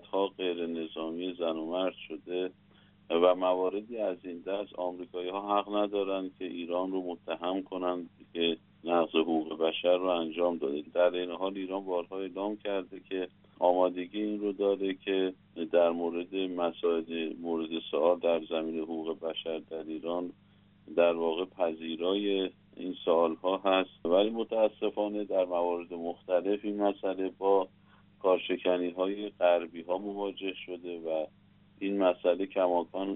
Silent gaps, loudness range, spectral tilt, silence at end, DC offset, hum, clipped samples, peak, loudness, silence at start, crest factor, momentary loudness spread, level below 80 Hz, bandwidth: none; 4 LU; -3 dB/octave; 0 s; under 0.1%; 50 Hz at -65 dBFS; under 0.1%; -12 dBFS; -31 LUFS; 0.15 s; 20 dB; 10 LU; -76 dBFS; 4 kHz